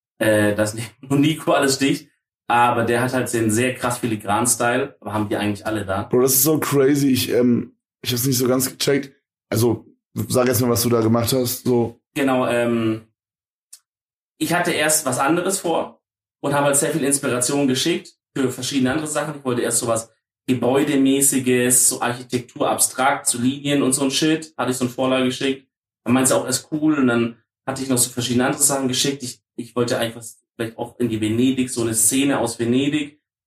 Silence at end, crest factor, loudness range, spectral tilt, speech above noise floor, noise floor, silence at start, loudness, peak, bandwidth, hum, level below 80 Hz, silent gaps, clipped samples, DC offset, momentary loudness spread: 0.35 s; 18 dB; 4 LU; -4 dB/octave; over 71 dB; under -90 dBFS; 0.2 s; -19 LUFS; -2 dBFS; 15.5 kHz; none; -60 dBFS; 12.07-12.11 s, 13.49-13.68 s, 13.88-13.93 s, 14.01-14.35 s, 25.77-25.82 s; under 0.1%; under 0.1%; 10 LU